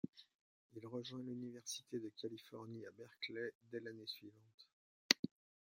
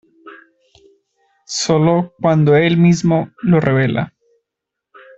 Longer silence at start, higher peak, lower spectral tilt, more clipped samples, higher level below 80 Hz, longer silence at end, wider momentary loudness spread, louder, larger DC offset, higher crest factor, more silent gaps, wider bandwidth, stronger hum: second, 0.05 s vs 0.25 s; second, -10 dBFS vs 0 dBFS; second, -2.5 dB/octave vs -6.5 dB/octave; neither; second, -88 dBFS vs -52 dBFS; second, 0.45 s vs 1.1 s; first, 19 LU vs 9 LU; second, -45 LUFS vs -15 LUFS; neither; first, 38 dB vs 16 dB; first, 0.09-0.13 s, 0.35-0.70 s, 3.55-3.61 s, 4.54-4.58 s, 4.73-5.09 s, 5.19-5.23 s vs none; first, 16 kHz vs 8 kHz; neither